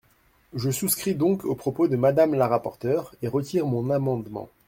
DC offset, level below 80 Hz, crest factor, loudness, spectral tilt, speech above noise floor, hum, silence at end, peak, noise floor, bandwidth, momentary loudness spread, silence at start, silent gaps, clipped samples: under 0.1%; -60 dBFS; 18 dB; -24 LUFS; -6 dB/octave; 38 dB; none; 0.2 s; -6 dBFS; -62 dBFS; 16.5 kHz; 8 LU; 0.55 s; none; under 0.1%